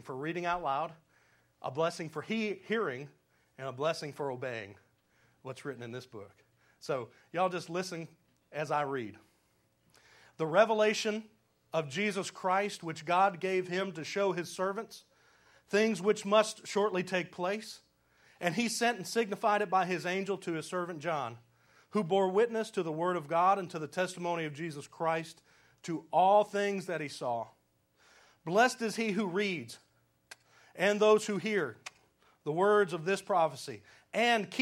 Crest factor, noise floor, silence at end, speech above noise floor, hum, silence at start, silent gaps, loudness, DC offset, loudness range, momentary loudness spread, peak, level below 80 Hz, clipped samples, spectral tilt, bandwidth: 22 dB; -73 dBFS; 0 s; 41 dB; none; 0.05 s; none; -32 LUFS; under 0.1%; 7 LU; 16 LU; -12 dBFS; -78 dBFS; under 0.1%; -4.5 dB/octave; 16 kHz